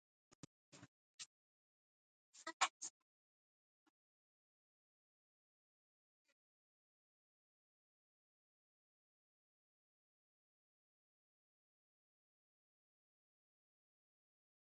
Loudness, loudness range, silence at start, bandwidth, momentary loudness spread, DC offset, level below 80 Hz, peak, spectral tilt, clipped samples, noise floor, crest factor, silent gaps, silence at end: -46 LUFS; 0 LU; 0.75 s; 7.4 kHz; 24 LU; under 0.1%; under -90 dBFS; -22 dBFS; 1 dB/octave; under 0.1%; under -90 dBFS; 36 dB; 0.88-1.19 s, 1.26-2.33 s, 2.53-2.60 s, 2.70-2.80 s; 11.8 s